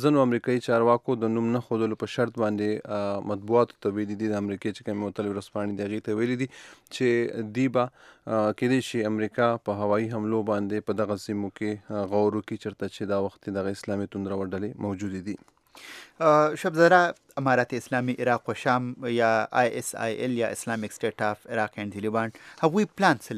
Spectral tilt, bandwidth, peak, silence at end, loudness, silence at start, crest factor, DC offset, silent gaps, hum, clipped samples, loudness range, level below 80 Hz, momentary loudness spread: -6 dB/octave; 14.5 kHz; -4 dBFS; 0 s; -27 LUFS; 0 s; 22 dB; under 0.1%; none; none; under 0.1%; 6 LU; -72 dBFS; 10 LU